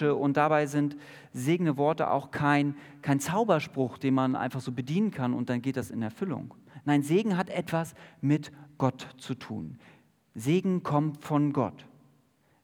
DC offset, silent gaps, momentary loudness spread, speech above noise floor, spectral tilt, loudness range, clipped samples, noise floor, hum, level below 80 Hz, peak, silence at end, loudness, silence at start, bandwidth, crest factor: under 0.1%; none; 13 LU; 38 dB; -7 dB/octave; 4 LU; under 0.1%; -66 dBFS; none; -72 dBFS; -8 dBFS; 0.8 s; -29 LUFS; 0 s; 19 kHz; 20 dB